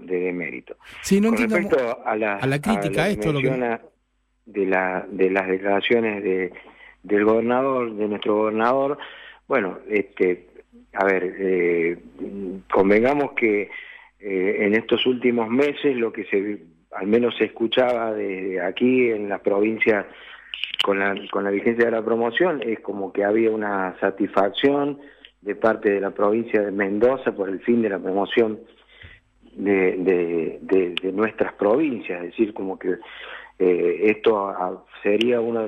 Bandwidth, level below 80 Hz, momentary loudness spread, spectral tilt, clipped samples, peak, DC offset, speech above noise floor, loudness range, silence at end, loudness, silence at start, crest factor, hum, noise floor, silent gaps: 14 kHz; -58 dBFS; 11 LU; -6 dB/octave; under 0.1%; -6 dBFS; under 0.1%; 47 dB; 2 LU; 0 s; -22 LUFS; 0 s; 16 dB; none; -69 dBFS; none